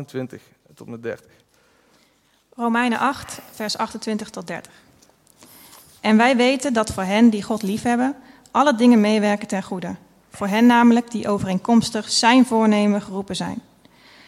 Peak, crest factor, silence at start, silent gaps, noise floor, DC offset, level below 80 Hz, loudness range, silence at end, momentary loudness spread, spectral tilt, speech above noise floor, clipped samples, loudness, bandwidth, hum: -2 dBFS; 18 dB; 0 s; none; -61 dBFS; under 0.1%; -56 dBFS; 9 LU; 0.7 s; 18 LU; -4.5 dB/octave; 42 dB; under 0.1%; -19 LUFS; 14.5 kHz; none